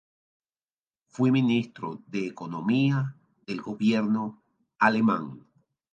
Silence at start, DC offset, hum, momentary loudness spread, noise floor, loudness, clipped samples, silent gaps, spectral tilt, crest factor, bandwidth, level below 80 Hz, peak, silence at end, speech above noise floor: 1.2 s; under 0.1%; none; 14 LU; under -90 dBFS; -27 LUFS; under 0.1%; none; -7.5 dB/octave; 22 dB; 7.4 kHz; -74 dBFS; -6 dBFS; 0.55 s; over 64 dB